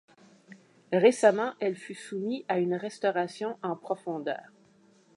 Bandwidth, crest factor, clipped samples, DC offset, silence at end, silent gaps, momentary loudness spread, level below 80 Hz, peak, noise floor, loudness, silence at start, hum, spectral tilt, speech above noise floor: 11.5 kHz; 22 dB; under 0.1%; under 0.1%; 0.75 s; none; 13 LU; -86 dBFS; -8 dBFS; -61 dBFS; -29 LUFS; 0.5 s; none; -5.5 dB/octave; 33 dB